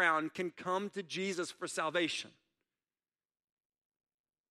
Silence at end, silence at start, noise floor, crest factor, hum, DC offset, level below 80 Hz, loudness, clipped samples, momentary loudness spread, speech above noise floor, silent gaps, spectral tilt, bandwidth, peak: 2.2 s; 0 s; under -90 dBFS; 22 dB; none; under 0.1%; -88 dBFS; -36 LUFS; under 0.1%; 7 LU; over 54 dB; none; -3.5 dB/octave; 14 kHz; -16 dBFS